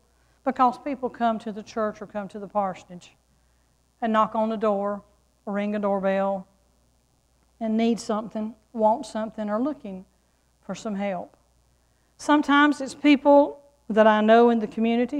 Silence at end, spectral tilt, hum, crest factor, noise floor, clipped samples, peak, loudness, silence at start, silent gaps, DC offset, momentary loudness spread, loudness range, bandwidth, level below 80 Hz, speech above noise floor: 0 s; -6 dB/octave; none; 18 dB; -65 dBFS; under 0.1%; -6 dBFS; -24 LUFS; 0.45 s; none; under 0.1%; 17 LU; 9 LU; 11 kHz; -64 dBFS; 42 dB